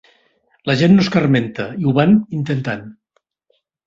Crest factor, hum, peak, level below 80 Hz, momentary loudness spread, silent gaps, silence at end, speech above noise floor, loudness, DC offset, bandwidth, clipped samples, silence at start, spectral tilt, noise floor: 16 dB; none; -2 dBFS; -52 dBFS; 13 LU; none; 0.95 s; 51 dB; -16 LUFS; under 0.1%; 7.6 kHz; under 0.1%; 0.65 s; -7.5 dB/octave; -66 dBFS